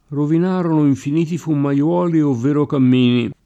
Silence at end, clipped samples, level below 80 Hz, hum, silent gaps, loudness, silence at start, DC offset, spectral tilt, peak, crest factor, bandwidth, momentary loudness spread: 0.15 s; under 0.1%; -60 dBFS; none; none; -17 LUFS; 0.1 s; under 0.1%; -8 dB/octave; -6 dBFS; 10 dB; 8.4 kHz; 5 LU